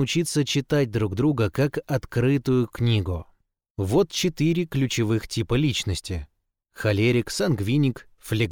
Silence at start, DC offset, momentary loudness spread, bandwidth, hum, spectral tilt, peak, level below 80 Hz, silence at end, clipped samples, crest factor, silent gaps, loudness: 0 s; under 0.1%; 8 LU; 19 kHz; none; -5.5 dB/octave; -10 dBFS; -46 dBFS; 0 s; under 0.1%; 14 dB; 3.70-3.75 s; -24 LUFS